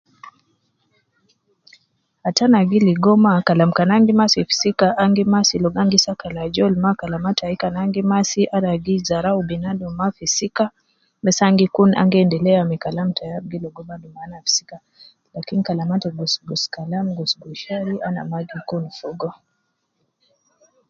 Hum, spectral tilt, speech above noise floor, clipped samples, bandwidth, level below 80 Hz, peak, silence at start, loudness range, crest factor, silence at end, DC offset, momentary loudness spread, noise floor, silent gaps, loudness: none; -5 dB/octave; 53 dB; under 0.1%; 7.6 kHz; -54 dBFS; 0 dBFS; 0.25 s; 9 LU; 20 dB; 1.6 s; under 0.1%; 14 LU; -71 dBFS; none; -18 LUFS